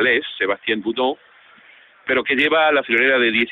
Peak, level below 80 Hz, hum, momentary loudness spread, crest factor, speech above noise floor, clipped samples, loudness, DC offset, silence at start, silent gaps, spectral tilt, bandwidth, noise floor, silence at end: -4 dBFS; -62 dBFS; none; 8 LU; 16 dB; 31 dB; under 0.1%; -18 LUFS; under 0.1%; 0 s; none; -5.5 dB/octave; 5.6 kHz; -49 dBFS; 0 s